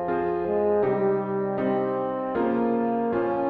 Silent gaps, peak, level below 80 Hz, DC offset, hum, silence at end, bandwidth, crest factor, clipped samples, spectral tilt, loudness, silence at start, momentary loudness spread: none; -12 dBFS; -58 dBFS; under 0.1%; none; 0 s; 4.6 kHz; 12 dB; under 0.1%; -10.5 dB/octave; -25 LUFS; 0 s; 4 LU